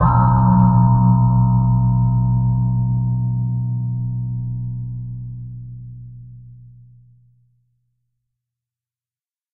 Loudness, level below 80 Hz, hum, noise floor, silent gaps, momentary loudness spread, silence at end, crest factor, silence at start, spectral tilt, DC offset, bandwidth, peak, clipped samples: -17 LUFS; -34 dBFS; none; under -90 dBFS; none; 20 LU; 2.95 s; 16 dB; 0 s; -13 dB/octave; under 0.1%; 1.8 kHz; -2 dBFS; under 0.1%